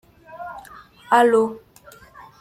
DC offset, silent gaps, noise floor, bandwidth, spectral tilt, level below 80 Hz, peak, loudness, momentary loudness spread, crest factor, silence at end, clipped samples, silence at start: under 0.1%; none; -48 dBFS; 15 kHz; -4.5 dB/octave; -62 dBFS; -4 dBFS; -18 LUFS; 24 LU; 20 dB; 0.85 s; under 0.1%; 0.35 s